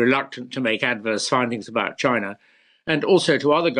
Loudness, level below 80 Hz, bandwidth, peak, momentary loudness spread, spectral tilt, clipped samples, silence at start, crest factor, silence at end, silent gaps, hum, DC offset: -21 LUFS; -64 dBFS; 11 kHz; -6 dBFS; 8 LU; -4.5 dB/octave; under 0.1%; 0 s; 16 dB; 0 s; none; none; under 0.1%